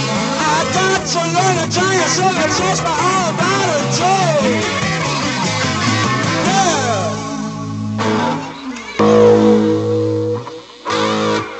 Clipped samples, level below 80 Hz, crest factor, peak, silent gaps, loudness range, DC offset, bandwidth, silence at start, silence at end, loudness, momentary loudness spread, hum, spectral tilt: under 0.1%; -48 dBFS; 16 dB; 0 dBFS; none; 2 LU; under 0.1%; 8.6 kHz; 0 s; 0 s; -15 LUFS; 10 LU; none; -4 dB/octave